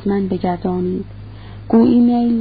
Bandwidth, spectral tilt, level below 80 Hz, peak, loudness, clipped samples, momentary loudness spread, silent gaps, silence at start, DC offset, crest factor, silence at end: 4.8 kHz; -13.5 dB/octave; -42 dBFS; -2 dBFS; -16 LUFS; under 0.1%; 23 LU; none; 0 s; 0.5%; 14 dB; 0 s